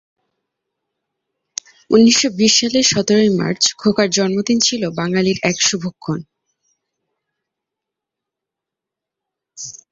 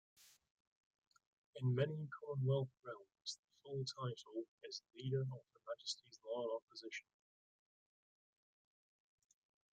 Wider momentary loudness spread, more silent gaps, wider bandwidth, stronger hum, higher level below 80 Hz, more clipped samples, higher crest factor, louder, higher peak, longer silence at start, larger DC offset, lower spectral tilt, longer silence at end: first, 18 LU vs 13 LU; second, none vs 0.51-0.91 s, 0.98-1.11 s, 1.27-1.53 s, 3.39-3.48 s, 4.48-4.58 s, 6.62-6.68 s; second, 7.8 kHz vs 9 kHz; neither; first, -58 dBFS vs under -90 dBFS; neither; about the same, 18 dB vs 22 dB; first, -15 LUFS vs -45 LUFS; first, -2 dBFS vs -24 dBFS; first, 1.9 s vs 0.2 s; neither; second, -3.5 dB/octave vs -6 dB/octave; second, 0.15 s vs 2.7 s